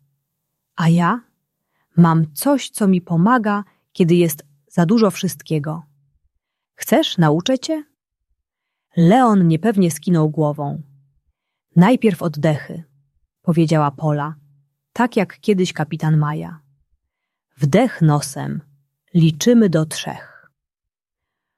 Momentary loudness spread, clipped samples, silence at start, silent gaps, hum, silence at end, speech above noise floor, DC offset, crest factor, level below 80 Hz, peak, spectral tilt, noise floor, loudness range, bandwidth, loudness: 14 LU; under 0.1%; 0.75 s; none; none; 1.35 s; 69 dB; under 0.1%; 16 dB; -60 dBFS; -2 dBFS; -6.5 dB/octave; -86 dBFS; 4 LU; 14 kHz; -17 LUFS